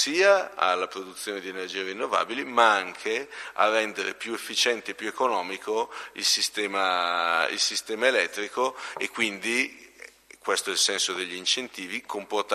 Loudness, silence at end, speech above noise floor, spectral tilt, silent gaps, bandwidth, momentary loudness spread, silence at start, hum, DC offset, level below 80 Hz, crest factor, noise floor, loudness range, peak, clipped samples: -26 LUFS; 0 s; 22 dB; -0.5 dB/octave; none; 13.5 kHz; 12 LU; 0 s; none; under 0.1%; -74 dBFS; 22 dB; -49 dBFS; 2 LU; -6 dBFS; under 0.1%